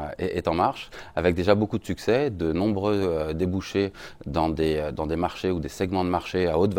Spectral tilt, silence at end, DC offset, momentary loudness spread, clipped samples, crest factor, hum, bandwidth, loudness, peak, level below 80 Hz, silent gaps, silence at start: -7 dB/octave; 0 s; under 0.1%; 6 LU; under 0.1%; 20 dB; none; 17 kHz; -25 LUFS; -6 dBFS; -44 dBFS; none; 0 s